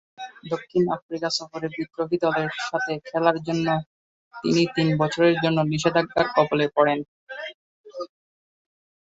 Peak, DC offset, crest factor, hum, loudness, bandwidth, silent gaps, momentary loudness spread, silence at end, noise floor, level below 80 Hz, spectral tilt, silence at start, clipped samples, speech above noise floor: -4 dBFS; under 0.1%; 20 dB; none; -23 LUFS; 8 kHz; 1.02-1.09 s, 3.86-4.31 s, 7.08-7.27 s, 7.54-7.84 s; 17 LU; 1 s; under -90 dBFS; -62 dBFS; -5.5 dB/octave; 0.2 s; under 0.1%; over 67 dB